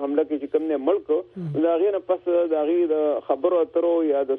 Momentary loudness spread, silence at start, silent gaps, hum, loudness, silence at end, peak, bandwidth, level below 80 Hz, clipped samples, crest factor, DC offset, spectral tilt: 4 LU; 0 s; none; none; -23 LUFS; 0 s; -8 dBFS; 3.8 kHz; -68 dBFS; under 0.1%; 14 dB; under 0.1%; -10.5 dB/octave